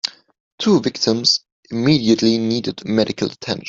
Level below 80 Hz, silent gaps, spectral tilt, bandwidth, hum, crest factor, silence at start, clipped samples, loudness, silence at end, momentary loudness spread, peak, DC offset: -56 dBFS; 0.40-0.58 s, 1.52-1.63 s; -4.5 dB/octave; 7.8 kHz; none; 16 dB; 0.05 s; under 0.1%; -18 LUFS; 0 s; 8 LU; -2 dBFS; under 0.1%